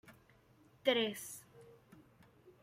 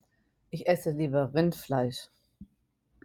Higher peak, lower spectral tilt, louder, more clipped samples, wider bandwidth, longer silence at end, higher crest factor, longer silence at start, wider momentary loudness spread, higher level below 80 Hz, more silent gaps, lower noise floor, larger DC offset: second, -18 dBFS vs -12 dBFS; second, -3 dB/octave vs -7 dB/octave; second, -37 LUFS vs -29 LUFS; neither; about the same, 16 kHz vs 17.5 kHz; second, 0.15 s vs 0.6 s; about the same, 24 dB vs 20 dB; second, 0.05 s vs 0.55 s; first, 27 LU vs 9 LU; second, -80 dBFS vs -62 dBFS; neither; second, -67 dBFS vs -73 dBFS; neither